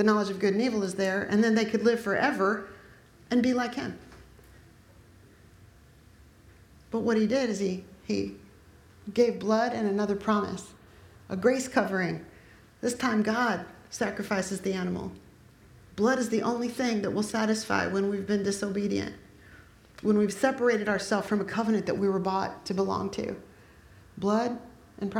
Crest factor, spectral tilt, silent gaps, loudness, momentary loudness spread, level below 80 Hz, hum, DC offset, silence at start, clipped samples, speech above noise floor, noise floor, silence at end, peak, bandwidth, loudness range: 20 dB; -5.5 dB/octave; none; -28 LUFS; 11 LU; -60 dBFS; none; under 0.1%; 0 s; under 0.1%; 28 dB; -55 dBFS; 0 s; -10 dBFS; 15 kHz; 5 LU